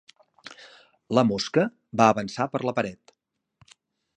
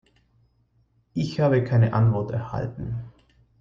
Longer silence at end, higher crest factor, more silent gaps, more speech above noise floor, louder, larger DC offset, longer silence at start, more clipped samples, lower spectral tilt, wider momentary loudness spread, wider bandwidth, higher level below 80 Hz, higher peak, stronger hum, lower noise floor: first, 1.2 s vs 0.5 s; first, 24 dB vs 16 dB; neither; first, 54 dB vs 43 dB; about the same, -24 LUFS vs -24 LUFS; neither; second, 0.5 s vs 1.15 s; neither; second, -5.5 dB/octave vs -9 dB/octave; first, 20 LU vs 14 LU; first, 9.8 kHz vs 7 kHz; second, -64 dBFS vs -50 dBFS; first, -2 dBFS vs -8 dBFS; neither; first, -78 dBFS vs -65 dBFS